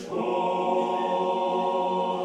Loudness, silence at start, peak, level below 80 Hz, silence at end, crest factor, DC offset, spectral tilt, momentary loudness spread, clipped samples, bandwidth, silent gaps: -26 LUFS; 0 s; -14 dBFS; -74 dBFS; 0 s; 12 dB; under 0.1%; -6 dB/octave; 1 LU; under 0.1%; 10 kHz; none